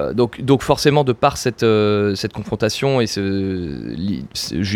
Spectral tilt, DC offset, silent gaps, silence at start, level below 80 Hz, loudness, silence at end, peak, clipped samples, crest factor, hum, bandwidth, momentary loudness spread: -5.5 dB/octave; under 0.1%; none; 0 s; -44 dBFS; -18 LUFS; 0 s; 0 dBFS; under 0.1%; 18 dB; none; 17 kHz; 9 LU